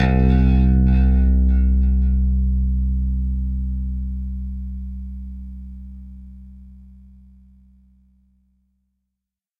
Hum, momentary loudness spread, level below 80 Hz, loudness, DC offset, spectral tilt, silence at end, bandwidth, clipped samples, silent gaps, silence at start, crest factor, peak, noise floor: none; 21 LU; -20 dBFS; -20 LUFS; under 0.1%; -10.5 dB/octave; 2.8 s; 3.9 kHz; under 0.1%; none; 0 s; 14 dB; -6 dBFS; -83 dBFS